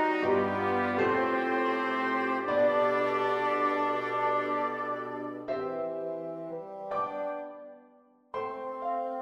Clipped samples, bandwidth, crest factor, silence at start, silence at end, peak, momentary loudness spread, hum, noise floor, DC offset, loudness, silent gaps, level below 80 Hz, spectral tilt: under 0.1%; 10 kHz; 14 dB; 0 s; 0 s; -16 dBFS; 11 LU; none; -60 dBFS; under 0.1%; -30 LUFS; none; -74 dBFS; -6.5 dB/octave